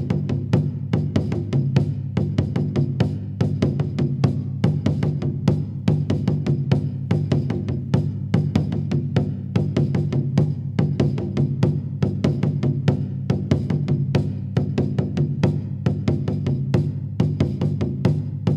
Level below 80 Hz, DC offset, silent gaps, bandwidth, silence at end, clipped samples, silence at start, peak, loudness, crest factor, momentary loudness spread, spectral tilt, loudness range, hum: -42 dBFS; under 0.1%; none; 7.4 kHz; 0 s; under 0.1%; 0 s; -4 dBFS; -22 LUFS; 18 dB; 3 LU; -9 dB/octave; 1 LU; none